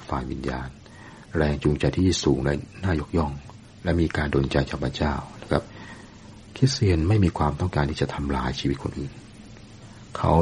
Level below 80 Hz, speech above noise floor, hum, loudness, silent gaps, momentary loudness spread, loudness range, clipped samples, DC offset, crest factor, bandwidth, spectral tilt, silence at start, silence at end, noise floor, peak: -36 dBFS; 21 dB; none; -25 LUFS; none; 23 LU; 2 LU; under 0.1%; under 0.1%; 22 dB; 10.5 kHz; -6.5 dB/octave; 0 s; 0 s; -45 dBFS; -2 dBFS